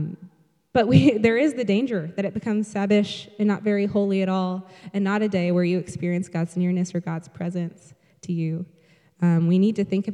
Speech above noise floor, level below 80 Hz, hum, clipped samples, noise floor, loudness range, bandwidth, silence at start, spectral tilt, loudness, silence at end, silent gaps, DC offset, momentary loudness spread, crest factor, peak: 30 dB; -60 dBFS; none; under 0.1%; -53 dBFS; 5 LU; 10.5 kHz; 0 s; -7.5 dB/octave; -23 LUFS; 0 s; none; under 0.1%; 12 LU; 20 dB; -2 dBFS